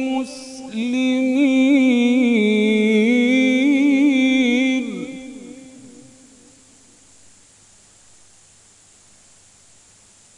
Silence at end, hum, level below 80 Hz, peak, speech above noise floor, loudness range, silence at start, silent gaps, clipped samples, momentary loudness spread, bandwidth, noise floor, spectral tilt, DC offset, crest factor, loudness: 4.5 s; none; -66 dBFS; -6 dBFS; 30 dB; 10 LU; 0 s; none; under 0.1%; 17 LU; 11 kHz; -51 dBFS; -5 dB/octave; under 0.1%; 14 dB; -17 LUFS